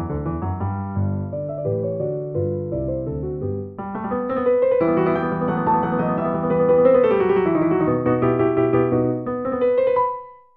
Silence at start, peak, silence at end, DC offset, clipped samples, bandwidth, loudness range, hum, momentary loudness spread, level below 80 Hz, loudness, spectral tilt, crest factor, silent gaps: 0 s; -6 dBFS; 0.2 s; 0.1%; under 0.1%; 4 kHz; 7 LU; none; 9 LU; -44 dBFS; -21 LUFS; -12 dB/octave; 14 dB; none